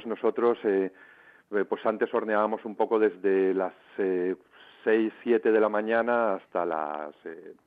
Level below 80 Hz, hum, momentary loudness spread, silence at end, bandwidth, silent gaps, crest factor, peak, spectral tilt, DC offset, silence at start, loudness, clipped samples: -78 dBFS; none; 10 LU; 0.15 s; 4.7 kHz; none; 14 dB; -12 dBFS; -8.5 dB/octave; under 0.1%; 0 s; -27 LUFS; under 0.1%